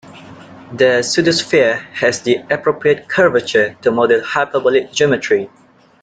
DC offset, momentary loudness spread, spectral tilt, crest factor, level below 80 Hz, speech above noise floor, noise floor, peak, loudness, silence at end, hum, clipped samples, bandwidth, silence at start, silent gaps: under 0.1%; 5 LU; -4 dB/octave; 14 dB; -56 dBFS; 22 dB; -37 dBFS; -2 dBFS; -15 LUFS; 0.55 s; none; under 0.1%; 9.4 kHz; 0.15 s; none